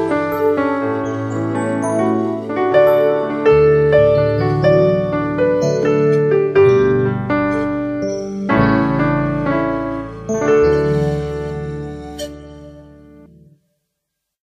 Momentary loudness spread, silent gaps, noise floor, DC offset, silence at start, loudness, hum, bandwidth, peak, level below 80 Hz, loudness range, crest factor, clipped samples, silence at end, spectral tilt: 12 LU; none; -77 dBFS; under 0.1%; 0 s; -16 LUFS; none; 14 kHz; 0 dBFS; -38 dBFS; 6 LU; 16 dB; under 0.1%; 1.7 s; -7.5 dB/octave